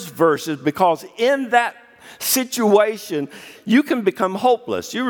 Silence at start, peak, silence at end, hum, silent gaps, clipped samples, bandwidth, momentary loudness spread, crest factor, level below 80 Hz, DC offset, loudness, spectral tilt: 0 s; -2 dBFS; 0 s; none; none; under 0.1%; 19 kHz; 9 LU; 18 dB; -68 dBFS; under 0.1%; -19 LUFS; -4 dB/octave